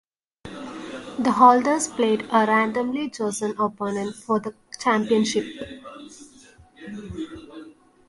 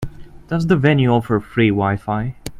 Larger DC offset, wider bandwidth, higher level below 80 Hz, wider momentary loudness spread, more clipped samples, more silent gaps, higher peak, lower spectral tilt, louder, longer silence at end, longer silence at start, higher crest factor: neither; second, 11.5 kHz vs 15 kHz; second, -58 dBFS vs -40 dBFS; first, 23 LU vs 9 LU; neither; neither; about the same, -2 dBFS vs 0 dBFS; second, -4 dB/octave vs -7.5 dB/octave; second, -21 LUFS vs -17 LUFS; first, 0.4 s vs 0 s; first, 0.45 s vs 0 s; about the same, 22 dB vs 18 dB